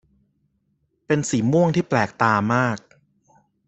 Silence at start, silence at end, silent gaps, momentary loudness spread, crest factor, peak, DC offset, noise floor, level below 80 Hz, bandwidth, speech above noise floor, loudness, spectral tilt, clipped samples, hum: 1.1 s; 0.9 s; none; 6 LU; 20 dB; -2 dBFS; under 0.1%; -69 dBFS; -58 dBFS; 8.4 kHz; 50 dB; -20 LUFS; -6 dB/octave; under 0.1%; none